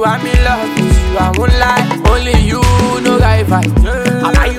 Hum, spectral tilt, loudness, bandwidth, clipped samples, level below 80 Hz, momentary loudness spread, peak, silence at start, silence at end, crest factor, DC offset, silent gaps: none; -5.5 dB/octave; -11 LUFS; 15.5 kHz; under 0.1%; -14 dBFS; 3 LU; 0 dBFS; 0 s; 0 s; 10 dB; under 0.1%; none